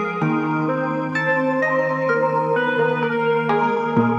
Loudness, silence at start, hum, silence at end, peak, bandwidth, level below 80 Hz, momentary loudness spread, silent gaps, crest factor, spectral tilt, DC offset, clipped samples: -20 LUFS; 0 s; none; 0 s; -6 dBFS; 7.4 kHz; -68 dBFS; 2 LU; none; 14 dB; -7.5 dB/octave; under 0.1%; under 0.1%